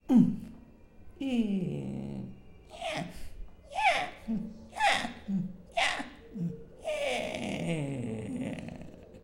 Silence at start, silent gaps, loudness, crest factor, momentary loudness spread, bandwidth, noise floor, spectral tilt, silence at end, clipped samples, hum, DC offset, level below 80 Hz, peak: 0.05 s; none; -33 LUFS; 22 dB; 17 LU; 15.5 kHz; -53 dBFS; -5.5 dB/octave; 0.05 s; under 0.1%; none; under 0.1%; -54 dBFS; -10 dBFS